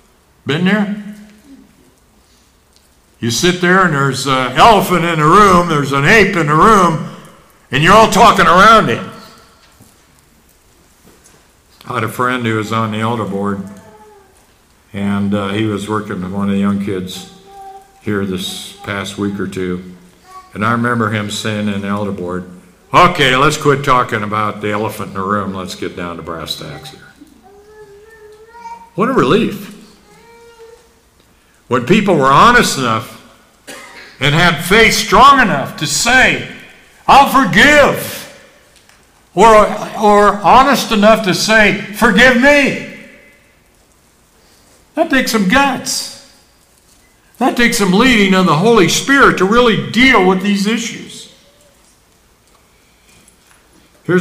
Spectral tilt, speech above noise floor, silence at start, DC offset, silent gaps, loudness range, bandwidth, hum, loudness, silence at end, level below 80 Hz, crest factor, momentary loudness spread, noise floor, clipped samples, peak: -4.5 dB/octave; 39 dB; 0.45 s; under 0.1%; none; 12 LU; 16 kHz; none; -11 LUFS; 0 s; -36 dBFS; 14 dB; 17 LU; -51 dBFS; under 0.1%; 0 dBFS